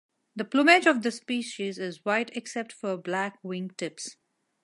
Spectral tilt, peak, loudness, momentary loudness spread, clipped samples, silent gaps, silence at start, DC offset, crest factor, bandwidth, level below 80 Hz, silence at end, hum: -4 dB/octave; -4 dBFS; -27 LUFS; 16 LU; under 0.1%; none; 0.35 s; under 0.1%; 24 dB; 11.5 kHz; -84 dBFS; 0.5 s; none